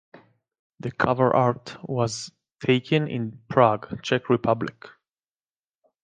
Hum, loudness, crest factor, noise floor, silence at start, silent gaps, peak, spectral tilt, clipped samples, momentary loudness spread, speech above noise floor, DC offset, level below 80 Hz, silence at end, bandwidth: none; -24 LUFS; 22 dB; under -90 dBFS; 0.15 s; 0.59-0.70 s; -2 dBFS; -6 dB/octave; under 0.1%; 14 LU; over 67 dB; under 0.1%; -58 dBFS; 1.15 s; 9.6 kHz